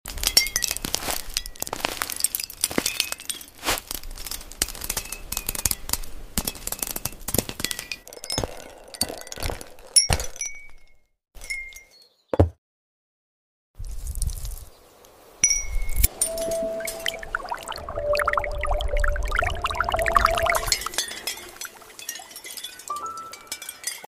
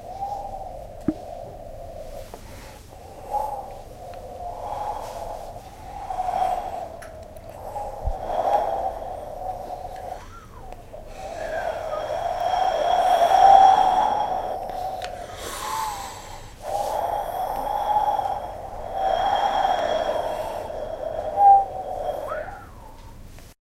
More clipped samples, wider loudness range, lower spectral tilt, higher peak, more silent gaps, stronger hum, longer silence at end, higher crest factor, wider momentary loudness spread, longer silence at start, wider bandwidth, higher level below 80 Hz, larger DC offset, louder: neither; second, 7 LU vs 15 LU; second, -2 dB/octave vs -4 dB/octave; about the same, 0 dBFS vs -2 dBFS; first, 12.58-13.74 s vs none; neither; second, 0 s vs 0.2 s; about the same, 28 dB vs 24 dB; second, 15 LU vs 22 LU; about the same, 0.05 s vs 0 s; about the same, 16 kHz vs 16 kHz; first, -34 dBFS vs -42 dBFS; neither; about the same, -26 LUFS vs -24 LUFS